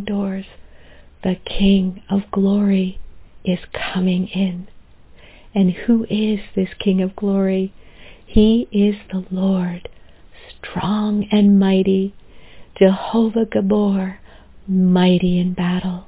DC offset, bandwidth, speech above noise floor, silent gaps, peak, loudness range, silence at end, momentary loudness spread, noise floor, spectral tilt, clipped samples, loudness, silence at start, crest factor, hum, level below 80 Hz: under 0.1%; 4 kHz; 27 dB; none; 0 dBFS; 4 LU; 0.05 s; 12 LU; -44 dBFS; -11.5 dB/octave; under 0.1%; -18 LUFS; 0 s; 18 dB; none; -38 dBFS